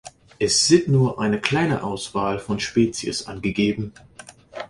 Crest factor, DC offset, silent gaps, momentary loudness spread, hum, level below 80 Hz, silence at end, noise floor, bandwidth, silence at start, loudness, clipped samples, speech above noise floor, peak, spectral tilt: 20 dB; under 0.1%; none; 11 LU; none; -50 dBFS; 0.05 s; -44 dBFS; 11.5 kHz; 0.05 s; -21 LUFS; under 0.1%; 23 dB; -2 dBFS; -4.5 dB/octave